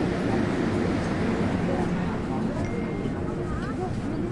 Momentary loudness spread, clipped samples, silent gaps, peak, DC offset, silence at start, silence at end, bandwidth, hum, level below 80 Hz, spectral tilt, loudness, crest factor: 4 LU; under 0.1%; none; -12 dBFS; under 0.1%; 0 s; 0 s; 11.5 kHz; none; -40 dBFS; -7.5 dB/octave; -27 LUFS; 14 dB